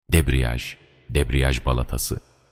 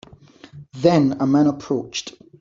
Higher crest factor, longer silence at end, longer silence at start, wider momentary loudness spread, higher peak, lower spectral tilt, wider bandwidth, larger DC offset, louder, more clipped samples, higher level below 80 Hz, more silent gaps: about the same, 18 dB vs 18 dB; about the same, 0.3 s vs 0.3 s; second, 0.1 s vs 0.55 s; second, 13 LU vs 16 LU; about the same, -4 dBFS vs -2 dBFS; second, -5 dB/octave vs -6.5 dB/octave; first, 18.5 kHz vs 7.6 kHz; neither; second, -24 LUFS vs -19 LUFS; neither; first, -26 dBFS vs -58 dBFS; neither